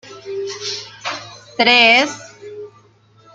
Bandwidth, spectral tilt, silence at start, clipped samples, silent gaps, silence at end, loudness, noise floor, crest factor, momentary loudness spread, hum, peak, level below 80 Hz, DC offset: 9.4 kHz; -1.5 dB/octave; 0.05 s; under 0.1%; none; 0.65 s; -15 LUFS; -51 dBFS; 18 dB; 25 LU; none; 0 dBFS; -68 dBFS; under 0.1%